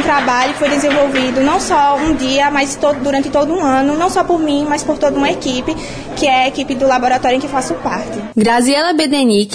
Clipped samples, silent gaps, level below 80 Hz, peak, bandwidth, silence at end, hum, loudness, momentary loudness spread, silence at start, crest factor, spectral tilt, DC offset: under 0.1%; none; -38 dBFS; -2 dBFS; 11 kHz; 0 s; none; -14 LUFS; 6 LU; 0 s; 12 dB; -3.5 dB/octave; under 0.1%